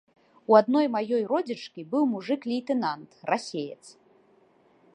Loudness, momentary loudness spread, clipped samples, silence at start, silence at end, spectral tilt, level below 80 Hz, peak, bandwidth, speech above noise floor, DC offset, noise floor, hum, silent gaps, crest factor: -26 LUFS; 16 LU; under 0.1%; 0.5 s; 1.05 s; -5.5 dB/octave; -82 dBFS; -4 dBFS; 10.5 kHz; 36 dB; under 0.1%; -61 dBFS; none; none; 22 dB